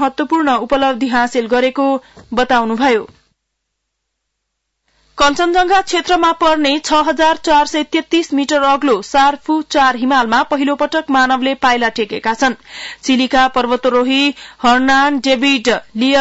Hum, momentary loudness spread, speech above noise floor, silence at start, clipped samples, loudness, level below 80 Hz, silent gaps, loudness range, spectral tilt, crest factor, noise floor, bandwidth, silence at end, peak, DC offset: none; 5 LU; 60 dB; 0 s; under 0.1%; -14 LUFS; -44 dBFS; none; 5 LU; -3 dB/octave; 12 dB; -73 dBFS; 8 kHz; 0 s; -2 dBFS; under 0.1%